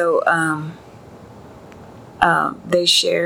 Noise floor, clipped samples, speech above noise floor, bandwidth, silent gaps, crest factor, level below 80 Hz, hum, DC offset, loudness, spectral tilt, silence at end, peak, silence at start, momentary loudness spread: -41 dBFS; under 0.1%; 23 dB; 17 kHz; none; 20 dB; -52 dBFS; none; under 0.1%; -17 LUFS; -3 dB/octave; 0 s; 0 dBFS; 0 s; 10 LU